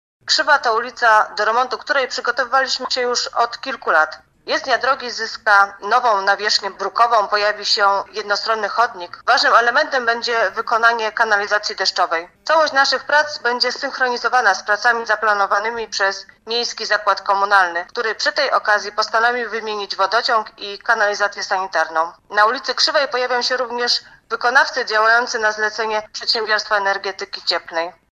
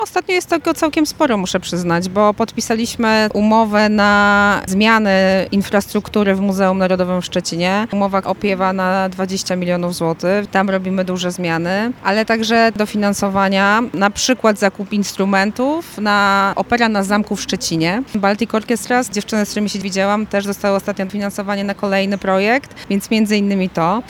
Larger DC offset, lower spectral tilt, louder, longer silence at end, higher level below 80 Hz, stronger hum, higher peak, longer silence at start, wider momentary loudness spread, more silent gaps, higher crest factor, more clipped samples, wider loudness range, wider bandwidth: neither; second, 0 dB/octave vs -4.5 dB/octave; about the same, -17 LUFS vs -16 LUFS; first, 0.25 s vs 0 s; second, -62 dBFS vs -48 dBFS; neither; about the same, 0 dBFS vs 0 dBFS; first, 0.25 s vs 0 s; about the same, 8 LU vs 7 LU; neither; about the same, 18 dB vs 16 dB; neither; about the same, 2 LU vs 4 LU; second, 11 kHz vs 17.5 kHz